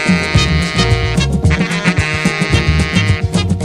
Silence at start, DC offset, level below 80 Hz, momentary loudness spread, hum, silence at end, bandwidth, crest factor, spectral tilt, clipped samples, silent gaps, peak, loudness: 0 s; under 0.1%; -22 dBFS; 2 LU; none; 0 s; 12 kHz; 12 dB; -5 dB/octave; under 0.1%; none; 0 dBFS; -14 LUFS